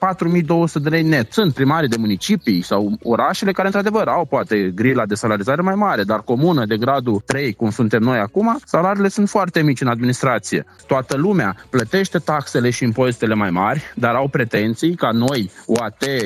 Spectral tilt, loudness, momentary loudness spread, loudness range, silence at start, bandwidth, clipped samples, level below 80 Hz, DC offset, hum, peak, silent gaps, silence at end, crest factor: -6 dB/octave; -18 LUFS; 4 LU; 1 LU; 0 s; 15.5 kHz; under 0.1%; -54 dBFS; under 0.1%; none; -2 dBFS; none; 0 s; 16 dB